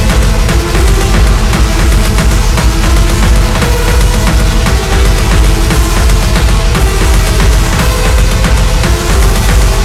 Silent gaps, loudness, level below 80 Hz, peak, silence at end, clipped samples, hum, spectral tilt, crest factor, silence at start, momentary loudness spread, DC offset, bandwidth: none; -10 LUFS; -8 dBFS; 0 dBFS; 0 s; under 0.1%; none; -4.5 dB/octave; 8 dB; 0 s; 1 LU; under 0.1%; 15.5 kHz